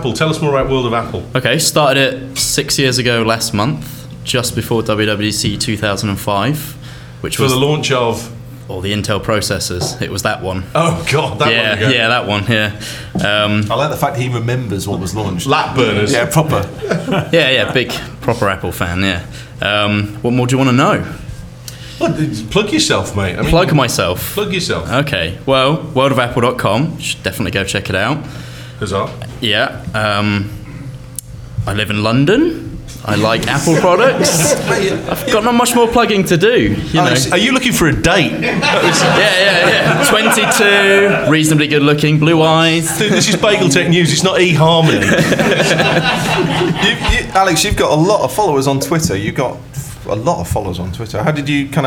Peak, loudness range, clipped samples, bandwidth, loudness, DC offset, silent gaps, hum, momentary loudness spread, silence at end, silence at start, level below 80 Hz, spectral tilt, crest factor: 0 dBFS; 7 LU; under 0.1%; 18.5 kHz; -13 LUFS; under 0.1%; none; none; 10 LU; 0 s; 0 s; -34 dBFS; -4.5 dB/octave; 14 dB